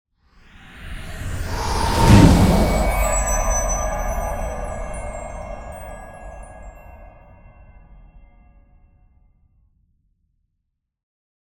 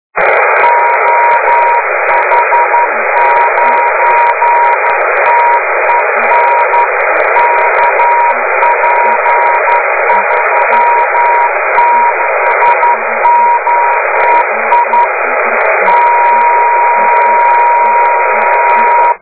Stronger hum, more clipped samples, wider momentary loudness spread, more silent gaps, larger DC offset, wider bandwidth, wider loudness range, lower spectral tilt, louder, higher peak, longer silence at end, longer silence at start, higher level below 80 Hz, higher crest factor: neither; second, under 0.1% vs 0.7%; first, 26 LU vs 2 LU; neither; second, under 0.1% vs 1%; first, 18.5 kHz vs 4 kHz; first, 21 LU vs 1 LU; about the same, -5.5 dB/octave vs -5.5 dB/octave; second, -19 LUFS vs -8 LUFS; about the same, 0 dBFS vs 0 dBFS; first, 3.55 s vs 0.05 s; first, 0.7 s vs 0.15 s; first, -28 dBFS vs -56 dBFS; first, 22 dB vs 8 dB